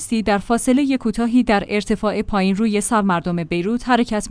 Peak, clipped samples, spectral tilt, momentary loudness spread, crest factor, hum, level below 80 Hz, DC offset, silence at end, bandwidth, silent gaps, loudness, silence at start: -4 dBFS; under 0.1%; -5 dB/octave; 4 LU; 14 dB; none; -40 dBFS; under 0.1%; 0 s; 10.5 kHz; none; -19 LUFS; 0 s